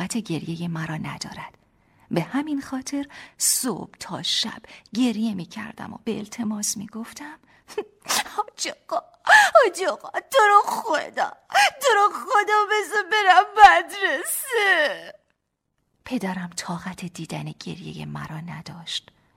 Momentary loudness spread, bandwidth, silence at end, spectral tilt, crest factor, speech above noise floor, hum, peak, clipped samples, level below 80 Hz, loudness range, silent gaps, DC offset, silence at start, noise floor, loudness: 19 LU; 16.5 kHz; 0.35 s; -2.5 dB/octave; 22 dB; 53 dB; none; 0 dBFS; under 0.1%; -58 dBFS; 12 LU; none; under 0.1%; 0 s; -76 dBFS; -21 LUFS